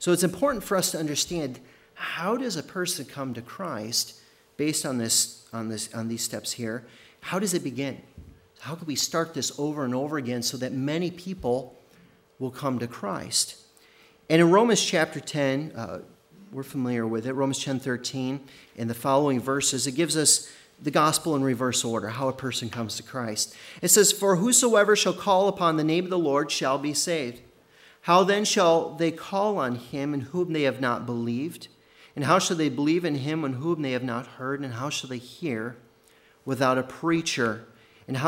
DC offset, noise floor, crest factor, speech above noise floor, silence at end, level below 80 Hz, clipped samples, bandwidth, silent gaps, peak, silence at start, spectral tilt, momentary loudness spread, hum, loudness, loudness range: under 0.1%; -59 dBFS; 22 dB; 33 dB; 0 s; -64 dBFS; under 0.1%; 16 kHz; none; -4 dBFS; 0 s; -3.5 dB/octave; 15 LU; none; -25 LUFS; 8 LU